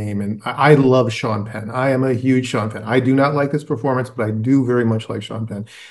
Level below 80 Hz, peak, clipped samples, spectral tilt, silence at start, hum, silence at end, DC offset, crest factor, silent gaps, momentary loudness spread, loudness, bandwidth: -60 dBFS; 0 dBFS; under 0.1%; -7.5 dB/octave; 0 s; none; 0 s; under 0.1%; 18 dB; none; 12 LU; -18 LUFS; 12 kHz